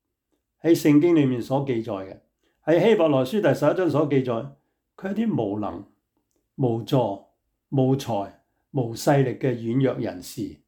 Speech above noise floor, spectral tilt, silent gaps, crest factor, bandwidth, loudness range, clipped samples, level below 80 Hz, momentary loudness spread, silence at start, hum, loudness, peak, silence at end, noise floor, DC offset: 54 dB; -7 dB/octave; none; 16 dB; 19 kHz; 6 LU; under 0.1%; -64 dBFS; 15 LU; 0.65 s; none; -23 LUFS; -8 dBFS; 0.15 s; -76 dBFS; under 0.1%